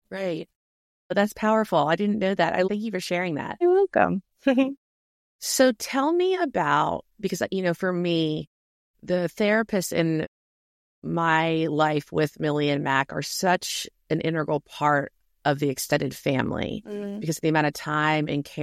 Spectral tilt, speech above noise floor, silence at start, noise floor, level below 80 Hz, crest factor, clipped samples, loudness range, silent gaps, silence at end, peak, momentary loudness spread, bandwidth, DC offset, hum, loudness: -5 dB/octave; over 66 dB; 0.1 s; under -90 dBFS; -60 dBFS; 20 dB; under 0.1%; 3 LU; 0.55-1.10 s, 4.77-5.39 s, 8.47-8.94 s, 10.28-11.02 s; 0 s; -4 dBFS; 9 LU; 16 kHz; under 0.1%; none; -25 LUFS